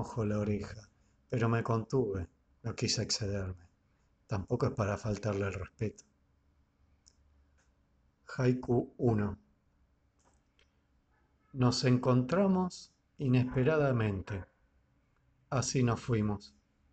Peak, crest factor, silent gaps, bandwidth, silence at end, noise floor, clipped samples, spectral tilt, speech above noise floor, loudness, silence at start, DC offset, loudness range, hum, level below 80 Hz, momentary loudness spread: -14 dBFS; 20 dB; none; 8.8 kHz; 0.45 s; -72 dBFS; under 0.1%; -6 dB/octave; 40 dB; -33 LUFS; 0 s; under 0.1%; 7 LU; none; -58 dBFS; 14 LU